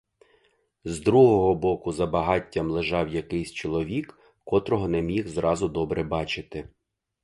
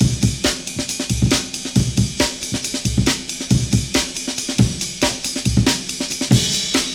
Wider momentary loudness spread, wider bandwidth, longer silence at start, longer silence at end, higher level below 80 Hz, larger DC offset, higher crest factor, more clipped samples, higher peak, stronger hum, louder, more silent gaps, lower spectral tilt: first, 14 LU vs 6 LU; second, 11.5 kHz vs 19 kHz; first, 0.85 s vs 0 s; first, 0.55 s vs 0 s; second, -46 dBFS vs -32 dBFS; neither; about the same, 20 dB vs 18 dB; neither; second, -6 dBFS vs -2 dBFS; neither; second, -25 LUFS vs -19 LUFS; neither; first, -6.5 dB/octave vs -4 dB/octave